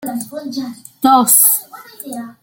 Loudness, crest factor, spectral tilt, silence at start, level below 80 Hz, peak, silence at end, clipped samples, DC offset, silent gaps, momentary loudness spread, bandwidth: -10 LUFS; 16 dB; -2 dB/octave; 0 s; -64 dBFS; 0 dBFS; 0.1 s; under 0.1%; under 0.1%; none; 21 LU; over 20 kHz